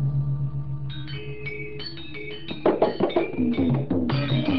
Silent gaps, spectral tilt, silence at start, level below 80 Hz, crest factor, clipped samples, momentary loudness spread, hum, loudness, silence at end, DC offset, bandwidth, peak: none; -10 dB/octave; 0 s; -44 dBFS; 18 dB; under 0.1%; 12 LU; none; -26 LUFS; 0 s; 1%; 5.4 kHz; -8 dBFS